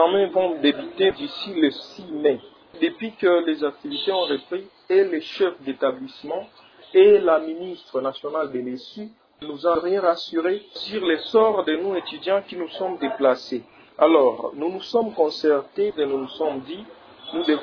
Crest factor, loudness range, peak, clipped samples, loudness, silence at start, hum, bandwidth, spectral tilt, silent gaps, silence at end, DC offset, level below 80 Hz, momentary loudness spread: 20 dB; 4 LU; -2 dBFS; under 0.1%; -22 LUFS; 0 s; none; 5.4 kHz; -6 dB/octave; none; 0 s; under 0.1%; -66 dBFS; 14 LU